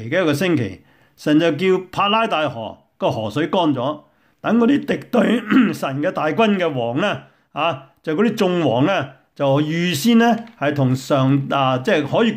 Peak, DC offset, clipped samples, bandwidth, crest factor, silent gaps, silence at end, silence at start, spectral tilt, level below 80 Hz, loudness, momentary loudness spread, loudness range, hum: -4 dBFS; under 0.1%; under 0.1%; 16 kHz; 14 dB; none; 0 s; 0 s; -6 dB/octave; -60 dBFS; -18 LUFS; 9 LU; 2 LU; none